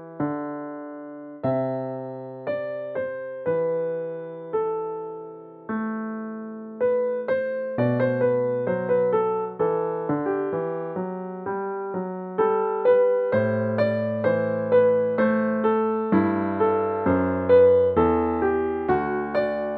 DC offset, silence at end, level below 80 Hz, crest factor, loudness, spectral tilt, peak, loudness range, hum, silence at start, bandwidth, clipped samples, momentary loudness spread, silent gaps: under 0.1%; 0 s; -54 dBFS; 16 dB; -24 LUFS; -11 dB/octave; -8 dBFS; 8 LU; none; 0 s; 4.5 kHz; under 0.1%; 13 LU; none